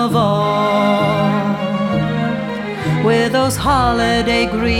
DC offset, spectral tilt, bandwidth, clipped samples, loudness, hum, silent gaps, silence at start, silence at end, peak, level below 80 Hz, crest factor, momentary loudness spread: under 0.1%; -5.5 dB/octave; 16.5 kHz; under 0.1%; -16 LUFS; none; none; 0 s; 0 s; -2 dBFS; -34 dBFS; 14 dB; 5 LU